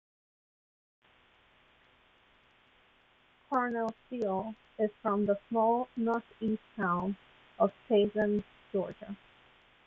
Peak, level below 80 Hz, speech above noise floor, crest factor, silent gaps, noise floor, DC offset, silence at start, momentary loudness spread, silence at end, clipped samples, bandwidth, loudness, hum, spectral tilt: -14 dBFS; -70 dBFS; 34 dB; 20 dB; none; -66 dBFS; under 0.1%; 3.5 s; 10 LU; 0.7 s; under 0.1%; 7 kHz; -32 LUFS; none; -8.5 dB/octave